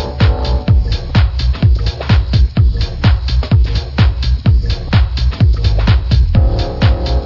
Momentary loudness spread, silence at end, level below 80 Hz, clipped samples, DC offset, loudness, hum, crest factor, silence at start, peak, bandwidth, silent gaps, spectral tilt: 3 LU; 0 s; -14 dBFS; under 0.1%; under 0.1%; -14 LUFS; none; 10 dB; 0 s; 0 dBFS; 6 kHz; none; -7.5 dB/octave